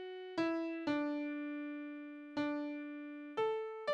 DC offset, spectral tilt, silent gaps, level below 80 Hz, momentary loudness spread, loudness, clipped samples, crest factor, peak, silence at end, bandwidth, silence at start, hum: under 0.1%; -5.5 dB/octave; none; -82 dBFS; 9 LU; -40 LUFS; under 0.1%; 16 dB; -24 dBFS; 0 s; 7.8 kHz; 0 s; none